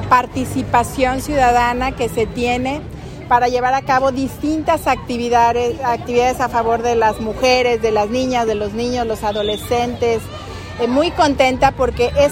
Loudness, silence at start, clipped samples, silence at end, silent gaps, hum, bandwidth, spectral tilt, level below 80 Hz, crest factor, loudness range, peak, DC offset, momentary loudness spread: -17 LUFS; 0 s; under 0.1%; 0 s; none; none; 16.5 kHz; -5 dB/octave; -34 dBFS; 16 dB; 2 LU; 0 dBFS; under 0.1%; 7 LU